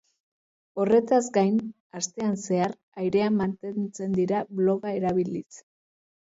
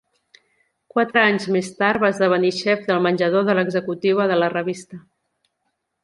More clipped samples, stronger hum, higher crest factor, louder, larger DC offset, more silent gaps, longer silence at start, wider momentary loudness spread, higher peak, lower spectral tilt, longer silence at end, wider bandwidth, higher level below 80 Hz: neither; neither; about the same, 18 dB vs 20 dB; second, -26 LUFS vs -19 LUFS; neither; first, 1.80-1.90 s, 2.83-2.92 s vs none; second, 0.75 s vs 0.95 s; about the same, 10 LU vs 8 LU; second, -10 dBFS vs -2 dBFS; about the same, -6 dB/octave vs -5.5 dB/octave; second, 0.6 s vs 1.05 s; second, 8 kHz vs 11.5 kHz; about the same, -64 dBFS vs -64 dBFS